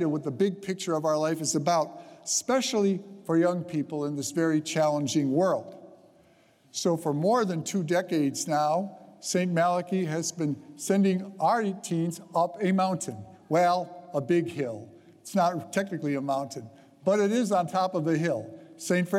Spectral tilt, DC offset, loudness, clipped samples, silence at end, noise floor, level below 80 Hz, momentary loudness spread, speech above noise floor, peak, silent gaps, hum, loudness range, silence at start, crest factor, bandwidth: -5 dB/octave; under 0.1%; -27 LUFS; under 0.1%; 0 s; -61 dBFS; -78 dBFS; 9 LU; 34 dB; -12 dBFS; none; none; 2 LU; 0 s; 16 dB; 15.5 kHz